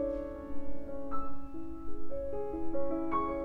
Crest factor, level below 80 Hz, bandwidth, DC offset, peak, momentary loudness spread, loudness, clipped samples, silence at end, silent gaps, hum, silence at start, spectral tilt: 10 dB; -48 dBFS; 3.6 kHz; under 0.1%; -20 dBFS; 11 LU; -39 LUFS; under 0.1%; 0 s; none; none; 0 s; -9 dB/octave